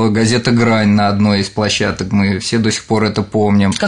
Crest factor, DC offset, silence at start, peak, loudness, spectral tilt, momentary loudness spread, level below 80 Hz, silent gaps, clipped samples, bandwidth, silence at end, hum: 12 dB; 0.8%; 0 s; -2 dBFS; -14 LUFS; -5.5 dB/octave; 4 LU; -44 dBFS; none; under 0.1%; 10.5 kHz; 0 s; none